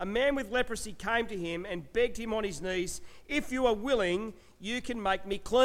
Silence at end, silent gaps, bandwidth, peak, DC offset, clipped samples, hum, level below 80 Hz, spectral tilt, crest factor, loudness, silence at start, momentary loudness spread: 0 s; none; 16 kHz; -14 dBFS; under 0.1%; under 0.1%; none; -50 dBFS; -4 dB/octave; 18 dB; -32 LUFS; 0 s; 8 LU